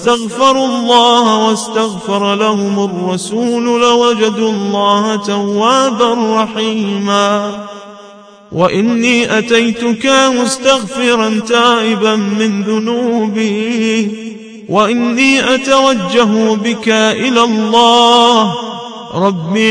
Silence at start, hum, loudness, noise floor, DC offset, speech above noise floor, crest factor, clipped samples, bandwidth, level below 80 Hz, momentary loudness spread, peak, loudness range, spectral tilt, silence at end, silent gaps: 0 s; none; -11 LUFS; -37 dBFS; under 0.1%; 26 dB; 12 dB; 0.1%; 10.5 kHz; -54 dBFS; 7 LU; 0 dBFS; 4 LU; -4 dB/octave; 0 s; none